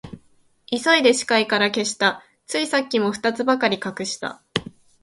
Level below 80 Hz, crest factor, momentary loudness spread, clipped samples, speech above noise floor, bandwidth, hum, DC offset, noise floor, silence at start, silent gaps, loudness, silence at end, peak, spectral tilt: -60 dBFS; 22 dB; 12 LU; under 0.1%; 37 dB; 11.5 kHz; none; under 0.1%; -58 dBFS; 0.05 s; none; -21 LUFS; 0.35 s; -2 dBFS; -3 dB/octave